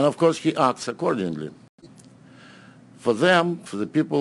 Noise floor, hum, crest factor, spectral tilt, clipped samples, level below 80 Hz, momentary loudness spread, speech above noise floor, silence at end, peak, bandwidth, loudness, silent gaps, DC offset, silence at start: -49 dBFS; none; 20 dB; -5.5 dB/octave; under 0.1%; -70 dBFS; 11 LU; 27 dB; 0 s; -4 dBFS; 11 kHz; -23 LUFS; 1.69-1.78 s; under 0.1%; 0 s